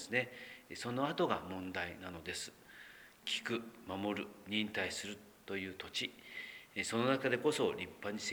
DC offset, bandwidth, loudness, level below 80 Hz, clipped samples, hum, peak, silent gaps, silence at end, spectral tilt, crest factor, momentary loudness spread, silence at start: under 0.1%; over 20 kHz; -39 LUFS; -72 dBFS; under 0.1%; none; -18 dBFS; none; 0 s; -4 dB/octave; 22 dB; 14 LU; 0 s